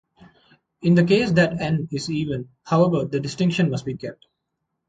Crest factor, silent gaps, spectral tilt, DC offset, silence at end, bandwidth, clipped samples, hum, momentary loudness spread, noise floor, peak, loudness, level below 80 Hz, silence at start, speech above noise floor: 18 dB; none; -7 dB/octave; under 0.1%; 0.75 s; 9.2 kHz; under 0.1%; none; 13 LU; -78 dBFS; -4 dBFS; -21 LUFS; -54 dBFS; 0.8 s; 57 dB